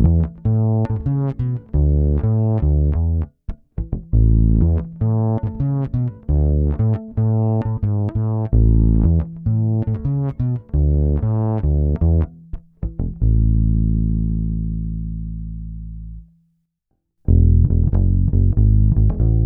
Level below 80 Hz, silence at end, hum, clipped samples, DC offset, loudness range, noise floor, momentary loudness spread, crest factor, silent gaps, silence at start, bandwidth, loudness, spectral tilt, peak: -20 dBFS; 0 s; none; under 0.1%; under 0.1%; 3 LU; -72 dBFS; 13 LU; 14 dB; none; 0 s; 2.2 kHz; -19 LUFS; -14 dB/octave; -2 dBFS